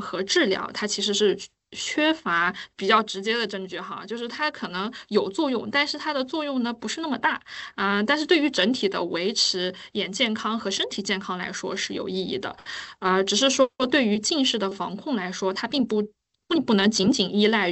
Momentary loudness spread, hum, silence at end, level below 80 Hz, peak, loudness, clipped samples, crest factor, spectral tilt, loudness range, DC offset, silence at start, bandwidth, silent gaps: 11 LU; none; 0 s; -66 dBFS; -6 dBFS; -24 LUFS; under 0.1%; 20 dB; -3 dB/octave; 3 LU; under 0.1%; 0 s; 8.4 kHz; none